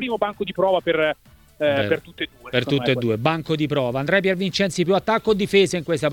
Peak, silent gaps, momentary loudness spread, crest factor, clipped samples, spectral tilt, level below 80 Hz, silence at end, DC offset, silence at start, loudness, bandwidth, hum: -4 dBFS; none; 6 LU; 18 dB; under 0.1%; -5.5 dB/octave; -52 dBFS; 0 s; under 0.1%; 0 s; -21 LUFS; 17.5 kHz; none